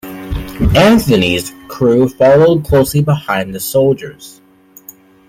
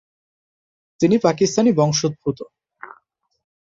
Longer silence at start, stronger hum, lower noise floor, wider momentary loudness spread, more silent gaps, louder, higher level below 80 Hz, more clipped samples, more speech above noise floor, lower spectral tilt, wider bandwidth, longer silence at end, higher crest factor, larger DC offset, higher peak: second, 0.05 s vs 1 s; neither; second, -40 dBFS vs -61 dBFS; first, 16 LU vs 13 LU; neither; first, -12 LUFS vs -18 LUFS; first, -30 dBFS vs -58 dBFS; neither; second, 29 dB vs 43 dB; about the same, -6 dB/octave vs -5.5 dB/octave; first, 16.5 kHz vs 8 kHz; first, 1 s vs 0.75 s; second, 12 dB vs 20 dB; neither; about the same, 0 dBFS vs -2 dBFS